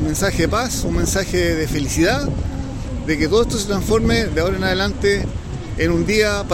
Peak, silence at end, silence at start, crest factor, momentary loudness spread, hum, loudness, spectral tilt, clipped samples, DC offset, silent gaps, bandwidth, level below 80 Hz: -4 dBFS; 0 s; 0 s; 14 dB; 9 LU; none; -19 LUFS; -4.5 dB/octave; under 0.1%; under 0.1%; none; 16.5 kHz; -28 dBFS